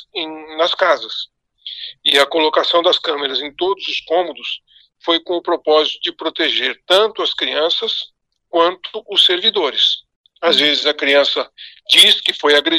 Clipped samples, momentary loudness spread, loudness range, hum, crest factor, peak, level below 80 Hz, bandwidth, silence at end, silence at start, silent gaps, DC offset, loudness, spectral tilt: under 0.1%; 14 LU; 5 LU; none; 16 dB; 0 dBFS; -66 dBFS; 15 kHz; 0 s; 0.15 s; 10.16-10.24 s; under 0.1%; -15 LUFS; -1 dB/octave